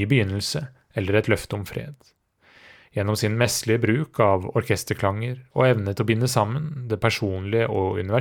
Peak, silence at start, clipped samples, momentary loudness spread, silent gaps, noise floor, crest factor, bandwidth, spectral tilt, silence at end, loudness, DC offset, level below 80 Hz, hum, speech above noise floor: -2 dBFS; 0 s; under 0.1%; 10 LU; none; -54 dBFS; 20 dB; 18.5 kHz; -5.5 dB/octave; 0 s; -23 LUFS; under 0.1%; -54 dBFS; none; 31 dB